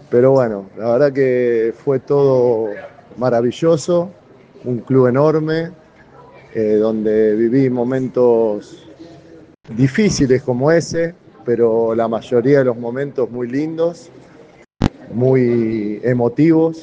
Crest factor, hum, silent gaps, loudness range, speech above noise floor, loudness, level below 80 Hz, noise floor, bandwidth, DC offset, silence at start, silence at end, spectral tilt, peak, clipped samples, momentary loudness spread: 16 dB; none; none; 3 LU; 29 dB; -16 LUFS; -44 dBFS; -44 dBFS; 9.4 kHz; under 0.1%; 0.1 s; 0 s; -7 dB/octave; 0 dBFS; under 0.1%; 10 LU